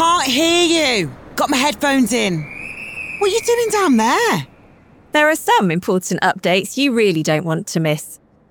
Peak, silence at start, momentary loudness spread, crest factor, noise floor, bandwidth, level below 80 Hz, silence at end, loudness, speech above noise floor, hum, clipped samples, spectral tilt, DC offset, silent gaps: -2 dBFS; 0 s; 11 LU; 14 dB; -47 dBFS; over 20 kHz; -52 dBFS; 0.35 s; -16 LUFS; 31 dB; none; under 0.1%; -4 dB/octave; under 0.1%; none